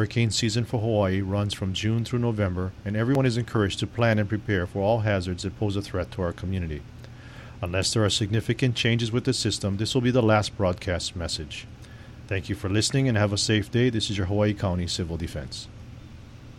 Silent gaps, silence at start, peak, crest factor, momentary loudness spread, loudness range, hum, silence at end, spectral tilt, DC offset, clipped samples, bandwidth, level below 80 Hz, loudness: none; 0 s; -8 dBFS; 18 dB; 15 LU; 4 LU; none; 0 s; -5 dB/octave; under 0.1%; under 0.1%; 12.5 kHz; -46 dBFS; -25 LUFS